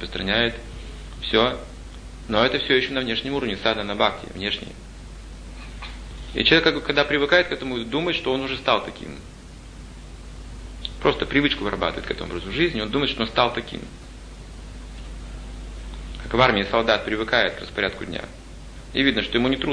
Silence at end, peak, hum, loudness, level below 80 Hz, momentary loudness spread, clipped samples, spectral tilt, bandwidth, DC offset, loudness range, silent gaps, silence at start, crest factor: 0 s; 0 dBFS; none; -22 LUFS; -38 dBFS; 22 LU; under 0.1%; -5 dB/octave; 10.5 kHz; under 0.1%; 6 LU; none; 0 s; 24 dB